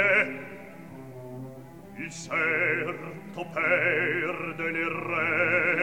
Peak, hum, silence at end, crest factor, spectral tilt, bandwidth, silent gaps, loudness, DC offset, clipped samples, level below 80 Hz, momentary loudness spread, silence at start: -10 dBFS; none; 0 s; 18 dB; -5 dB/octave; 17.5 kHz; none; -26 LUFS; 0.2%; under 0.1%; -66 dBFS; 21 LU; 0 s